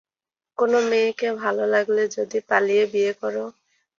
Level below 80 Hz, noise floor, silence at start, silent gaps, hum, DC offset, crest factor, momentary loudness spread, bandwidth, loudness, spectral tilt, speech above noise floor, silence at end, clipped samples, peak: -72 dBFS; under -90 dBFS; 0.6 s; none; none; under 0.1%; 18 dB; 9 LU; 7.4 kHz; -22 LUFS; -4 dB/octave; over 69 dB; 0.5 s; under 0.1%; -4 dBFS